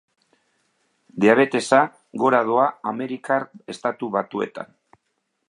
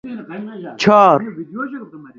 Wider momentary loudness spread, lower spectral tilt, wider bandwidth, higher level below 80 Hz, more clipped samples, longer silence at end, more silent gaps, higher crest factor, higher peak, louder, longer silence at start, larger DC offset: second, 14 LU vs 20 LU; about the same, -5.5 dB/octave vs -6 dB/octave; first, 11 kHz vs 7.6 kHz; second, -74 dBFS vs -60 dBFS; neither; first, 0.85 s vs 0.1 s; neither; about the same, 22 dB vs 18 dB; about the same, -2 dBFS vs 0 dBFS; second, -21 LUFS vs -13 LUFS; first, 1.15 s vs 0.05 s; neither